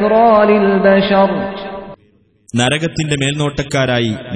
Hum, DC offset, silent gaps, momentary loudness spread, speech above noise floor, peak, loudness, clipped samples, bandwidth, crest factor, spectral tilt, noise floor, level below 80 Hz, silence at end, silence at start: none; under 0.1%; none; 13 LU; 40 dB; 0 dBFS; -13 LUFS; under 0.1%; 10.5 kHz; 14 dB; -5.5 dB/octave; -53 dBFS; -42 dBFS; 0 s; 0 s